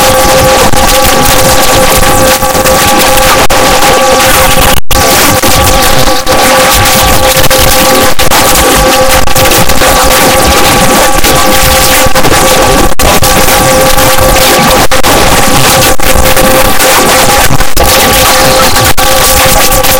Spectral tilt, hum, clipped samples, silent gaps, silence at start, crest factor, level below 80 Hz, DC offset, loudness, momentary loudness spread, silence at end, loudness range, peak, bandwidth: -2.5 dB/octave; none; 10%; none; 0 s; 4 dB; -14 dBFS; 10%; -4 LUFS; 2 LU; 0 s; 0 LU; 0 dBFS; over 20 kHz